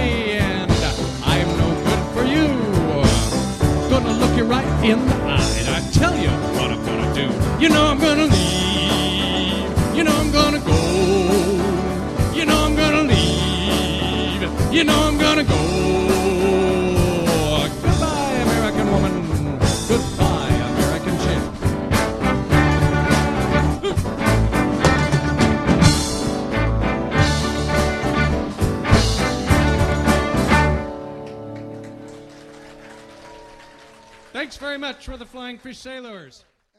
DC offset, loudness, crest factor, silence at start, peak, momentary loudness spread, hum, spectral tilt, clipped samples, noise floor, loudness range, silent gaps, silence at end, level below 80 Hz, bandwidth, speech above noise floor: under 0.1%; -18 LUFS; 18 dB; 0 s; 0 dBFS; 9 LU; none; -5 dB/octave; under 0.1%; -46 dBFS; 7 LU; none; 0.55 s; -28 dBFS; 13 kHz; 22 dB